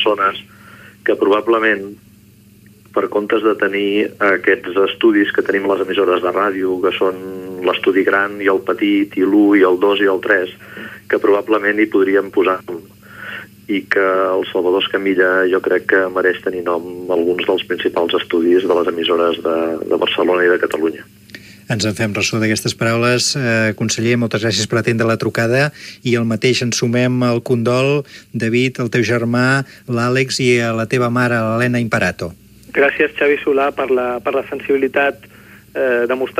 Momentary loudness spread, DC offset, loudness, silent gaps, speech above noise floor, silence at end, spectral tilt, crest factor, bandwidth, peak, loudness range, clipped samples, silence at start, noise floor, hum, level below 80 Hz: 8 LU; under 0.1%; -16 LUFS; none; 30 dB; 0 s; -5 dB/octave; 16 dB; 15.5 kHz; 0 dBFS; 3 LU; under 0.1%; 0 s; -46 dBFS; none; -56 dBFS